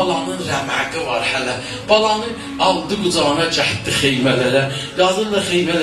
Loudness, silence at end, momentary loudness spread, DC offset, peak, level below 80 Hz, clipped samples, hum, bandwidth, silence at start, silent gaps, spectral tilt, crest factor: -17 LUFS; 0 s; 6 LU; 0.1%; 0 dBFS; -46 dBFS; under 0.1%; none; 13 kHz; 0 s; none; -4 dB/octave; 18 dB